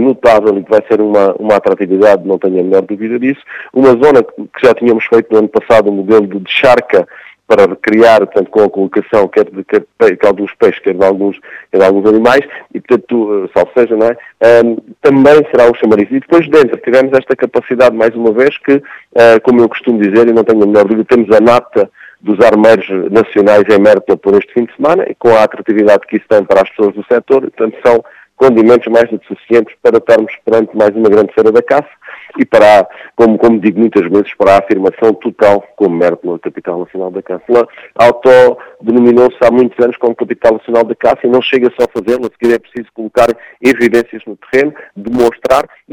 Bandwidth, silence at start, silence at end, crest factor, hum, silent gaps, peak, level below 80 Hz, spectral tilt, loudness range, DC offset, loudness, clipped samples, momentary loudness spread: 13 kHz; 0 s; 0.3 s; 8 dB; none; none; 0 dBFS; -46 dBFS; -6.5 dB/octave; 3 LU; under 0.1%; -9 LUFS; 1%; 9 LU